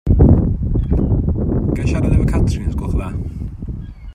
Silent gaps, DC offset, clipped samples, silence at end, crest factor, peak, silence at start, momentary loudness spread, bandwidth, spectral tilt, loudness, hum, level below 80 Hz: none; under 0.1%; under 0.1%; 0 s; 16 dB; 0 dBFS; 0.05 s; 16 LU; 10.5 kHz; -9 dB/octave; -17 LUFS; none; -20 dBFS